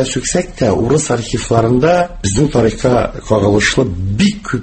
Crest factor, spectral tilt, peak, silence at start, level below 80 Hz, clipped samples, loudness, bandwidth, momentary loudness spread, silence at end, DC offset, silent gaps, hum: 14 dB; -5 dB/octave; 0 dBFS; 0 s; -32 dBFS; under 0.1%; -14 LUFS; 8.8 kHz; 5 LU; 0 s; under 0.1%; none; none